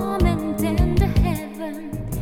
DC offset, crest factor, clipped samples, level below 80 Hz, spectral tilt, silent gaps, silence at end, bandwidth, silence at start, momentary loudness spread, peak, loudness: under 0.1%; 16 dB; under 0.1%; -26 dBFS; -7 dB/octave; none; 0 s; 17 kHz; 0 s; 12 LU; -6 dBFS; -22 LUFS